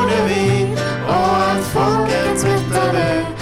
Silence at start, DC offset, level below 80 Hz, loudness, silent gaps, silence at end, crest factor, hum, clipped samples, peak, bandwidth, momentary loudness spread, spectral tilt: 0 s; under 0.1%; -40 dBFS; -17 LUFS; none; 0 s; 8 dB; none; under 0.1%; -8 dBFS; 16 kHz; 3 LU; -5.5 dB/octave